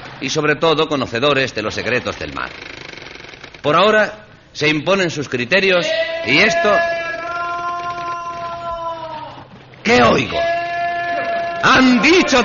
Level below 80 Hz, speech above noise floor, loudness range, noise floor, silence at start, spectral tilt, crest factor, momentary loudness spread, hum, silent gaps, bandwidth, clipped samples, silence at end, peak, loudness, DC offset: -46 dBFS; 24 dB; 4 LU; -39 dBFS; 0 s; -2.5 dB/octave; 16 dB; 17 LU; none; none; 7.4 kHz; under 0.1%; 0 s; -2 dBFS; -16 LUFS; under 0.1%